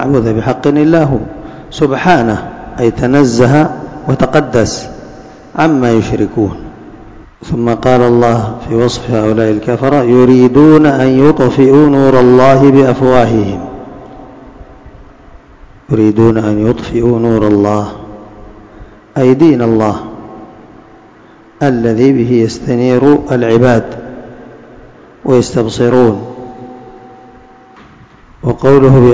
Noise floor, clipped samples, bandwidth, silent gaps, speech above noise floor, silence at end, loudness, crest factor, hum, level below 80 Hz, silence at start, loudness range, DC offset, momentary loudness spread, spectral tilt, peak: -39 dBFS; 3%; 8 kHz; none; 31 dB; 0 s; -9 LUFS; 10 dB; none; -34 dBFS; 0 s; 8 LU; under 0.1%; 20 LU; -7.5 dB/octave; 0 dBFS